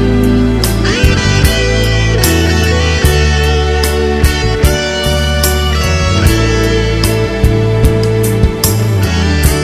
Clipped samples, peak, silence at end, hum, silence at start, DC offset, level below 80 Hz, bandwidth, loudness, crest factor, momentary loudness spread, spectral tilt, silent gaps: 0.2%; 0 dBFS; 0 s; none; 0 s; under 0.1%; -16 dBFS; 14.5 kHz; -11 LUFS; 10 dB; 2 LU; -5 dB/octave; none